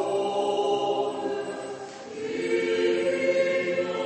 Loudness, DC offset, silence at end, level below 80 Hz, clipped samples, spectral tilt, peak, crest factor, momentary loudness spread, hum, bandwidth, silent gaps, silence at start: -26 LUFS; under 0.1%; 0 s; -72 dBFS; under 0.1%; -4.5 dB/octave; -12 dBFS; 14 dB; 11 LU; none; 8.8 kHz; none; 0 s